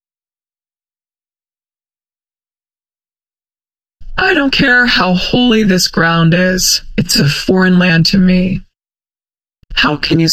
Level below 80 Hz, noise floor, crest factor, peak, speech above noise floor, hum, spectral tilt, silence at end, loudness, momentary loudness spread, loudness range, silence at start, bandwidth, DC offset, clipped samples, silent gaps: -32 dBFS; under -90 dBFS; 14 dB; 0 dBFS; over 80 dB; none; -4 dB/octave; 0 s; -11 LUFS; 5 LU; 5 LU; 4 s; 15.5 kHz; under 0.1%; under 0.1%; none